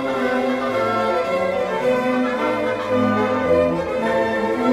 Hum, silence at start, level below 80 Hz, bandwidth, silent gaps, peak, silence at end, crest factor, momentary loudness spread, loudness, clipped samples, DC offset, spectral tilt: none; 0 s; -50 dBFS; 13.5 kHz; none; -6 dBFS; 0 s; 14 dB; 3 LU; -20 LUFS; under 0.1%; under 0.1%; -6 dB/octave